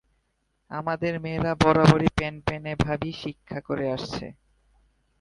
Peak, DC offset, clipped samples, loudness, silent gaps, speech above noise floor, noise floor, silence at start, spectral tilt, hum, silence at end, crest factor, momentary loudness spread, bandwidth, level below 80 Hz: -2 dBFS; under 0.1%; under 0.1%; -25 LUFS; none; 49 dB; -73 dBFS; 0.7 s; -7 dB/octave; none; 0.9 s; 24 dB; 18 LU; 11 kHz; -44 dBFS